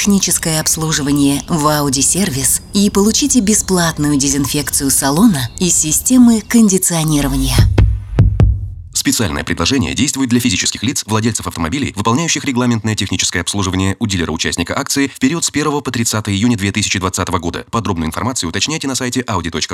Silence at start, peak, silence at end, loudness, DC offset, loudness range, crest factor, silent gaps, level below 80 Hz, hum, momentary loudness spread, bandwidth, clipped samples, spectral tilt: 0 s; 0 dBFS; 0 s; -14 LUFS; under 0.1%; 4 LU; 14 dB; none; -26 dBFS; none; 7 LU; 17 kHz; under 0.1%; -4 dB/octave